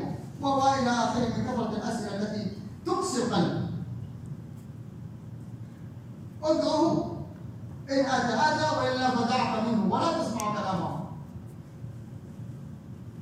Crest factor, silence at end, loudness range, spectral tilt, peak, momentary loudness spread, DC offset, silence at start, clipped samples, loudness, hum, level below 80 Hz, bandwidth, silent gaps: 18 dB; 0 s; 7 LU; -5.5 dB/octave; -12 dBFS; 18 LU; under 0.1%; 0 s; under 0.1%; -28 LUFS; none; -60 dBFS; 15.5 kHz; none